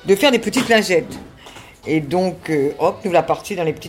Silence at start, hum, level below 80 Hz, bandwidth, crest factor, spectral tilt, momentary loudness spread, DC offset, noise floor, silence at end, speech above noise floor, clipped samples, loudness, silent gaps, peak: 0.05 s; none; -52 dBFS; 16.5 kHz; 16 dB; -4.5 dB/octave; 16 LU; under 0.1%; -40 dBFS; 0 s; 23 dB; under 0.1%; -18 LUFS; none; -2 dBFS